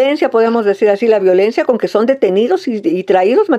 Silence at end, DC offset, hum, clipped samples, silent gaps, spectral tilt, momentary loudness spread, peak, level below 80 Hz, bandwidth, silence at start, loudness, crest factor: 0 s; under 0.1%; none; under 0.1%; none; -6.5 dB/octave; 4 LU; 0 dBFS; -64 dBFS; 8.8 kHz; 0 s; -13 LUFS; 12 dB